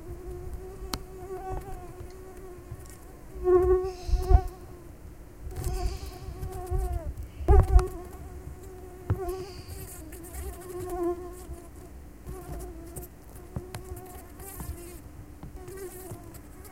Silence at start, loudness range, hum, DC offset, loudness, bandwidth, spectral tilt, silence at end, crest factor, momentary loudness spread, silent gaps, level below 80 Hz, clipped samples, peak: 0 s; 13 LU; none; 0.2%; -32 LUFS; 16.5 kHz; -7 dB/octave; 0 s; 24 dB; 21 LU; none; -32 dBFS; under 0.1%; -6 dBFS